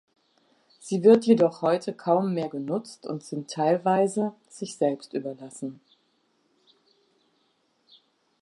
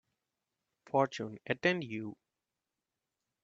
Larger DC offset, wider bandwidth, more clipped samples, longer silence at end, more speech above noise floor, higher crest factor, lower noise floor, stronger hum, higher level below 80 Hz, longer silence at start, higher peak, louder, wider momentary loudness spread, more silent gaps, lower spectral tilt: neither; first, 11.5 kHz vs 7.8 kHz; neither; first, 2.65 s vs 1.3 s; second, 45 dB vs 56 dB; about the same, 20 dB vs 24 dB; second, -70 dBFS vs -90 dBFS; neither; about the same, -78 dBFS vs -78 dBFS; about the same, 0.85 s vs 0.95 s; first, -6 dBFS vs -14 dBFS; first, -25 LUFS vs -34 LUFS; first, 18 LU vs 11 LU; neither; about the same, -6.5 dB/octave vs -5.5 dB/octave